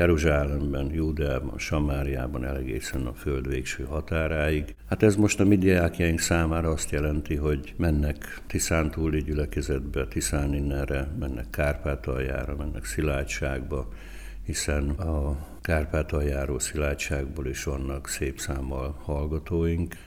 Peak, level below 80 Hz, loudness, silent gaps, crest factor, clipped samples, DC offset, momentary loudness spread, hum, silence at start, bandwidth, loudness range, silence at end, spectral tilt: -8 dBFS; -32 dBFS; -28 LUFS; none; 20 dB; under 0.1%; under 0.1%; 9 LU; none; 0 s; 15.5 kHz; 6 LU; 0 s; -5.5 dB/octave